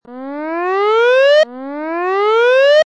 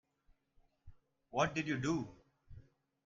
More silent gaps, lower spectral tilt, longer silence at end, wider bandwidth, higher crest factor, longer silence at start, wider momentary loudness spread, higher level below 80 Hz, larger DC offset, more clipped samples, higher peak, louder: neither; second, -1.5 dB/octave vs -5.5 dB/octave; second, 0.05 s vs 0.45 s; first, 8.8 kHz vs 7.6 kHz; second, 10 dB vs 22 dB; second, 0.1 s vs 0.85 s; first, 14 LU vs 8 LU; second, -74 dBFS vs -66 dBFS; neither; neither; first, -4 dBFS vs -20 dBFS; first, -13 LUFS vs -37 LUFS